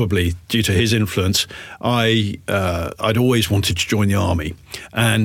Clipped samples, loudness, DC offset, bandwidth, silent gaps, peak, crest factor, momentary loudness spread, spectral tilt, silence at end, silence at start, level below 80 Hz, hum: under 0.1%; -19 LUFS; under 0.1%; 17 kHz; none; -6 dBFS; 14 dB; 8 LU; -5 dB/octave; 0 s; 0 s; -38 dBFS; none